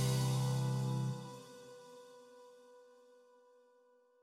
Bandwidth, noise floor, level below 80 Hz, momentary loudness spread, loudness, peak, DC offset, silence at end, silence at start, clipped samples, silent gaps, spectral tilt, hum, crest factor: 15 kHz; -69 dBFS; -68 dBFS; 25 LU; -37 LUFS; -24 dBFS; under 0.1%; 1.4 s; 0 s; under 0.1%; none; -6 dB/octave; none; 16 dB